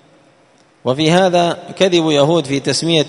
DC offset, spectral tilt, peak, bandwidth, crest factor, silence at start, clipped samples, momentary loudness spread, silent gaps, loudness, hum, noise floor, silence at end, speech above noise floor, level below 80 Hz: under 0.1%; -5 dB/octave; 0 dBFS; 11 kHz; 16 dB; 0.85 s; under 0.1%; 7 LU; none; -14 LUFS; none; -51 dBFS; 0 s; 37 dB; -56 dBFS